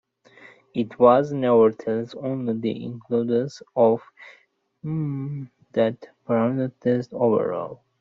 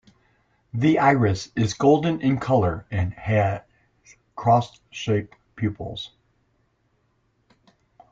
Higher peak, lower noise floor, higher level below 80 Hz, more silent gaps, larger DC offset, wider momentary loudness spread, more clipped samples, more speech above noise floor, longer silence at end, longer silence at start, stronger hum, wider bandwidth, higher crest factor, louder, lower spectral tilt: first, -2 dBFS vs -6 dBFS; second, -51 dBFS vs -68 dBFS; second, -66 dBFS vs -52 dBFS; neither; neither; about the same, 14 LU vs 16 LU; neither; second, 28 dB vs 46 dB; second, 0.25 s vs 2.05 s; about the same, 0.75 s vs 0.75 s; neither; about the same, 7.4 kHz vs 7.6 kHz; about the same, 20 dB vs 20 dB; about the same, -23 LUFS vs -23 LUFS; about the same, -7.5 dB/octave vs -7 dB/octave